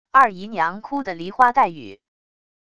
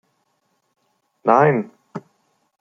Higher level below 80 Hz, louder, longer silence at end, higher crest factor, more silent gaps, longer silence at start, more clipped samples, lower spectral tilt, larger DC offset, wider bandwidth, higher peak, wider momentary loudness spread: first, -60 dBFS vs -70 dBFS; second, -20 LUFS vs -17 LUFS; first, 0.8 s vs 0.6 s; about the same, 20 dB vs 20 dB; neither; second, 0.15 s vs 1.25 s; neither; second, -5.5 dB/octave vs -9 dB/octave; first, 0.5% vs under 0.1%; first, 11 kHz vs 7.2 kHz; about the same, -2 dBFS vs -2 dBFS; second, 12 LU vs 22 LU